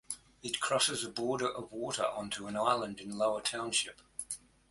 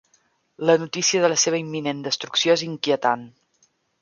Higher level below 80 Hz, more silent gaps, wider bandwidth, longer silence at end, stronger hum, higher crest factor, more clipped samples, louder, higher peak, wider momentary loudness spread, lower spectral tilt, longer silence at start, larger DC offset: about the same, -68 dBFS vs -72 dBFS; neither; first, 12 kHz vs 7.4 kHz; second, 0.35 s vs 0.7 s; neither; about the same, 20 dB vs 20 dB; neither; second, -34 LUFS vs -21 LUFS; second, -14 dBFS vs -4 dBFS; first, 11 LU vs 8 LU; about the same, -2 dB/octave vs -2.5 dB/octave; second, 0.1 s vs 0.6 s; neither